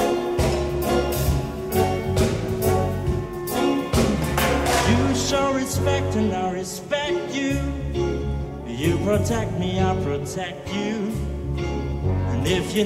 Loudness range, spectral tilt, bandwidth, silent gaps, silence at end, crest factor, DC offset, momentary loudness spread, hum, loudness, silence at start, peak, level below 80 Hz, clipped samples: 3 LU; -5.5 dB/octave; 16 kHz; none; 0 s; 16 dB; under 0.1%; 7 LU; none; -23 LUFS; 0 s; -6 dBFS; -32 dBFS; under 0.1%